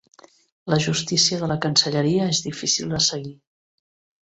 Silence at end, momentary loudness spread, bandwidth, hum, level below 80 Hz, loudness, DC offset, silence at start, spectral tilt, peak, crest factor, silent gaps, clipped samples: 0.9 s; 7 LU; 8.2 kHz; none; -58 dBFS; -20 LUFS; under 0.1%; 0.65 s; -3.5 dB/octave; -2 dBFS; 22 dB; none; under 0.1%